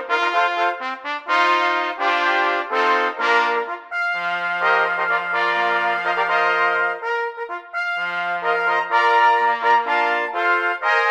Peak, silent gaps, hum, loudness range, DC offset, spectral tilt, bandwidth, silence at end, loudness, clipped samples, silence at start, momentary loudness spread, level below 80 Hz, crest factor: -4 dBFS; none; none; 2 LU; under 0.1%; -2.5 dB/octave; 9.4 kHz; 0 s; -19 LUFS; under 0.1%; 0 s; 7 LU; -76 dBFS; 14 dB